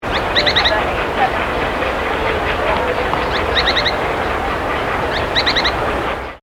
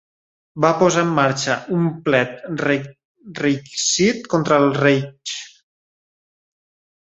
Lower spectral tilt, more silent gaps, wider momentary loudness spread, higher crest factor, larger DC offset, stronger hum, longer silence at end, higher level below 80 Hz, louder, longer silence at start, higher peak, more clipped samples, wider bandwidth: about the same, -4.5 dB/octave vs -4.5 dB/octave; second, none vs 3.05-3.15 s; second, 5 LU vs 13 LU; about the same, 16 dB vs 18 dB; neither; neither; second, 0.05 s vs 1.7 s; first, -30 dBFS vs -60 dBFS; first, -16 LUFS vs -19 LUFS; second, 0 s vs 0.55 s; about the same, 0 dBFS vs -2 dBFS; neither; first, 18.5 kHz vs 8.4 kHz